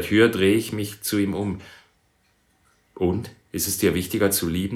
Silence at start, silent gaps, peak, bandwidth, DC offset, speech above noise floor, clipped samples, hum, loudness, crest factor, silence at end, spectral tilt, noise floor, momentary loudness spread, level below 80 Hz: 0 s; none; -4 dBFS; 19 kHz; under 0.1%; 43 dB; under 0.1%; none; -23 LUFS; 20 dB; 0 s; -4.5 dB/octave; -65 dBFS; 12 LU; -54 dBFS